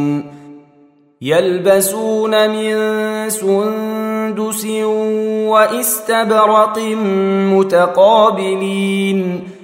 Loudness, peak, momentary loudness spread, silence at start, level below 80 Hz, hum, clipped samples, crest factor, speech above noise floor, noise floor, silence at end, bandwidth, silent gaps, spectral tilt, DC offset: -14 LUFS; 0 dBFS; 8 LU; 0 s; -66 dBFS; none; under 0.1%; 14 dB; 35 dB; -49 dBFS; 0 s; 16.5 kHz; none; -4.5 dB/octave; under 0.1%